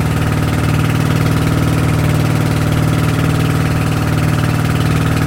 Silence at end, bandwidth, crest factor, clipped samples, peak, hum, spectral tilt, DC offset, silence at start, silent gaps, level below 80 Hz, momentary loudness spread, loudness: 0 s; 16.5 kHz; 12 dB; under 0.1%; -2 dBFS; none; -6.5 dB/octave; under 0.1%; 0 s; none; -26 dBFS; 1 LU; -14 LUFS